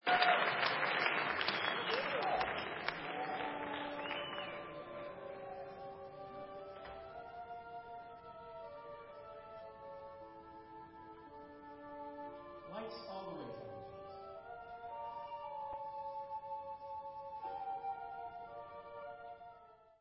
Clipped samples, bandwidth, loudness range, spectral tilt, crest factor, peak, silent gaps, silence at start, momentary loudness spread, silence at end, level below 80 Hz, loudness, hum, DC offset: under 0.1%; 5.6 kHz; 15 LU; -0.5 dB/octave; 26 dB; -16 dBFS; none; 0.05 s; 19 LU; 0.05 s; -72 dBFS; -41 LUFS; none; under 0.1%